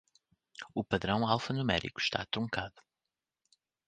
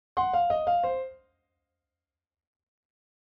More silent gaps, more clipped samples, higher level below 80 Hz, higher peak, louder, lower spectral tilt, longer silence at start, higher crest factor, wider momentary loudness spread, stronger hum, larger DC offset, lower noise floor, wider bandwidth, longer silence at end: neither; neither; about the same, -58 dBFS vs -62 dBFS; first, -12 dBFS vs -16 dBFS; second, -33 LUFS vs -27 LUFS; second, -5.5 dB/octave vs -7 dB/octave; first, 0.6 s vs 0.15 s; first, 24 dB vs 16 dB; first, 13 LU vs 9 LU; neither; neither; about the same, -90 dBFS vs under -90 dBFS; first, 9.4 kHz vs 5.4 kHz; second, 1.1 s vs 2.15 s